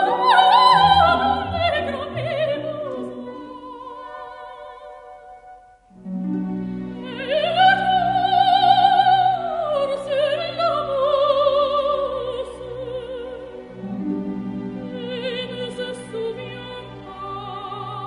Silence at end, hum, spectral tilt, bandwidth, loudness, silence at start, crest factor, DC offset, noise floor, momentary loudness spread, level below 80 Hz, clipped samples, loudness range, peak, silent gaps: 0 s; none; -5.5 dB/octave; 10.5 kHz; -20 LUFS; 0 s; 20 dB; under 0.1%; -47 dBFS; 21 LU; -48 dBFS; under 0.1%; 14 LU; 0 dBFS; none